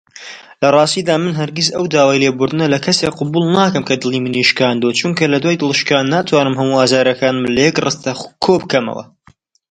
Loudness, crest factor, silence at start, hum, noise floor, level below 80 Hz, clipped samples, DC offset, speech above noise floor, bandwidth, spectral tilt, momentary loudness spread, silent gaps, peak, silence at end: -14 LUFS; 14 dB; 0.15 s; none; -51 dBFS; -54 dBFS; under 0.1%; under 0.1%; 37 dB; 10.5 kHz; -4.5 dB/octave; 6 LU; none; 0 dBFS; 0.7 s